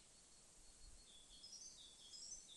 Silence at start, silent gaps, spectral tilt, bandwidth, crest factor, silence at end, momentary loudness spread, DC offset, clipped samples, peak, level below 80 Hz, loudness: 0 s; none; 0 dB/octave; 11.5 kHz; 16 dB; 0 s; 11 LU; under 0.1%; under 0.1%; -44 dBFS; -72 dBFS; -59 LUFS